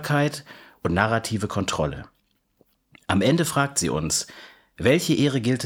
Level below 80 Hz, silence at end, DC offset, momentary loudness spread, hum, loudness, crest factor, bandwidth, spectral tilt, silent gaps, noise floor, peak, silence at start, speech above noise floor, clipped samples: -48 dBFS; 0 s; under 0.1%; 11 LU; none; -23 LUFS; 22 dB; 18.5 kHz; -4.5 dB/octave; none; -65 dBFS; -2 dBFS; 0 s; 42 dB; under 0.1%